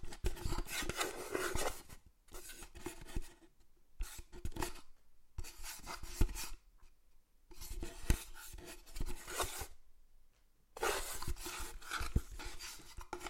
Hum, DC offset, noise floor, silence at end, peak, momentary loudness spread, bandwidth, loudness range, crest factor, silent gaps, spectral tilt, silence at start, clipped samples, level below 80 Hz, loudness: none; under 0.1%; -67 dBFS; 0 s; -16 dBFS; 14 LU; 16.5 kHz; 7 LU; 26 dB; none; -3.5 dB/octave; 0 s; under 0.1%; -46 dBFS; -44 LUFS